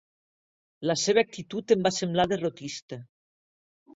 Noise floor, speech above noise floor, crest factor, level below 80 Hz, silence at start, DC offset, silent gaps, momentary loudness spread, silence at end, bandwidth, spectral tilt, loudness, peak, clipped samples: under -90 dBFS; over 63 dB; 20 dB; -62 dBFS; 0.8 s; under 0.1%; 2.82-2.88 s; 15 LU; 0.9 s; 8 kHz; -4 dB/octave; -26 LUFS; -8 dBFS; under 0.1%